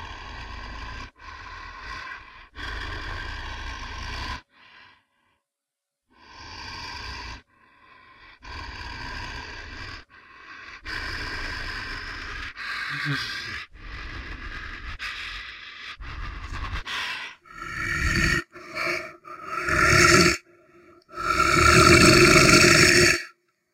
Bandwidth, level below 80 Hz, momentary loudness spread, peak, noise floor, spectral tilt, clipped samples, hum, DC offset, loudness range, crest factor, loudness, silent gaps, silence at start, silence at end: 16 kHz; -40 dBFS; 25 LU; -2 dBFS; -86 dBFS; -3.5 dB/octave; under 0.1%; none; under 0.1%; 22 LU; 22 dB; -20 LUFS; none; 0 s; 0.45 s